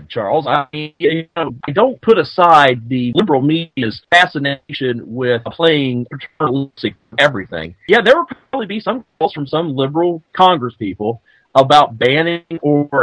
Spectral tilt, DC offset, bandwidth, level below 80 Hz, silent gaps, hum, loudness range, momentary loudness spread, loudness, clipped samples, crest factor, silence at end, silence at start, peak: -6 dB/octave; under 0.1%; 11 kHz; -54 dBFS; none; none; 4 LU; 12 LU; -15 LUFS; 0.2%; 14 dB; 0 s; 0 s; 0 dBFS